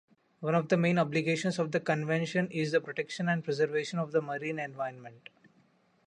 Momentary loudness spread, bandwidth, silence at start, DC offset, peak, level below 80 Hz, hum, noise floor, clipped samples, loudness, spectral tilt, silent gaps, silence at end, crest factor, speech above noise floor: 10 LU; 10.5 kHz; 0.4 s; under 0.1%; -12 dBFS; -76 dBFS; none; -67 dBFS; under 0.1%; -31 LUFS; -6 dB/octave; none; 0.9 s; 18 dB; 37 dB